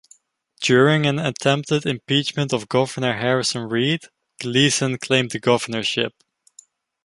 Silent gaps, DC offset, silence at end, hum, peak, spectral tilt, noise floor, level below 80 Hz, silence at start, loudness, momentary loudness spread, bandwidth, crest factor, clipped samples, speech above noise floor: none; under 0.1%; 0.95 s; none; -2 dBFS; -4.5 dB/octave; -58 dBFS; -60 dBFS; 0.6 s; -20 LUFS; 6 LU; 11.5 kHz; 20 dB; under 0.1%; 38 dB